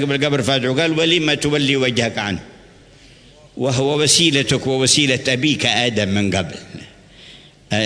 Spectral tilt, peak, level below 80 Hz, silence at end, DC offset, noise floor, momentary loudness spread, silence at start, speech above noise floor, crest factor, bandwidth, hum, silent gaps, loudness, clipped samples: -3.5 dB/octave; -2 dBFS; -50 dBFS; 0 s; under 0.1%; -46 dBFS; 11 LU; 0 s; 28 dB; 18 dB; 11 kHz; none; none; -16 LUFS; under 0.1%